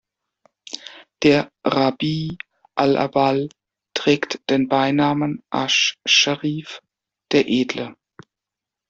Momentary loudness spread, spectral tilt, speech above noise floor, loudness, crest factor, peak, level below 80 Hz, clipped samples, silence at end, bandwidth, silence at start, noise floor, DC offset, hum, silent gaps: 18 LU; -4 dB/octave; 67 dB; -19 LUFS; 18 dB; -2 dBFS; -60 dBFS; under 0.1%; 0.95 s; 8 kHz; 0.7 s; -86 dBFS; under 0.1%; none; none